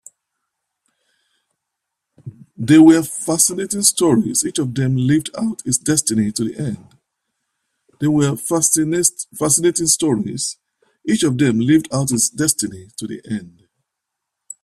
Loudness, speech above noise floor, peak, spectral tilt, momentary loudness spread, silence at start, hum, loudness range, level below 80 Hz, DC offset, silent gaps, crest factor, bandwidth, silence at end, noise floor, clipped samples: -16 LUFS; 63 dB; 0 dBFS; -4 dB/octave; 13 LU; 2.25 s; none; 5 LU; -56 dBFS; under 0.1%; none; 18 dB; 15 kHz; 1.15 s; -80 dBFS; under 0.1%